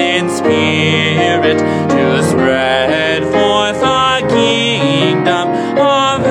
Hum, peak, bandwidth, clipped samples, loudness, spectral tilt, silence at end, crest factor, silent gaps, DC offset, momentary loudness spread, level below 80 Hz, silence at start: none; 0 dBFS; 13.5 kHz; under 0.1%; -12 LUFS; -5 dB/octave; 0 s; 12 dB; none; under 0.1%; 2 LU; -50 dBFS; 0 s